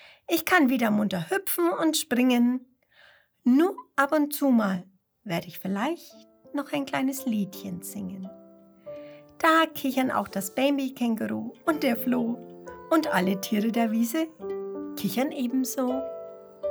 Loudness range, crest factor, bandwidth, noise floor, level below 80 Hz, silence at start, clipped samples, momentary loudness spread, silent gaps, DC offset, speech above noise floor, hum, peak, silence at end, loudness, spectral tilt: 6 LU; 20 dB; over 20 kHz; -58 dBFS; -70 dBFS; 0.05 s; under 0.1%; 14 LU; none; under 0.1%; 33 dB; none; -6 dBFS; 0 s; -26 LUFS; -4.5 dB/octave